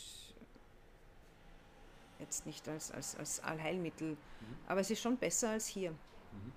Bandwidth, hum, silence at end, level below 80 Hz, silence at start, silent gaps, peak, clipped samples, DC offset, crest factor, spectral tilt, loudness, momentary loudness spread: 15.5 kHz; none; 0 s; -62 dBFS; 0 s; none; -22 dBFS; under 0.1%; under 0.1%; 20 dB; -3.5 dB/octave; -40 LUFS; 22 LU